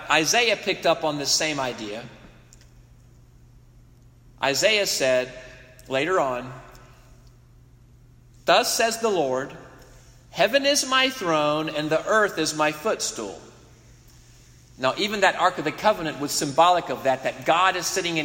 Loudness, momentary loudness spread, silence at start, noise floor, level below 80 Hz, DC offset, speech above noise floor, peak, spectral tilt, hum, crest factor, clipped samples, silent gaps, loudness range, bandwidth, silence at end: -22 LUFS; 14 LU; 0 s; -52 dBFS; -56 dBFS; under 0.1%; 29 dB; -4 dBFS; -2.5 dB/octave; none; 20 dB; under 0.1%; none; 6 LU; 16.5 kHz; 0 s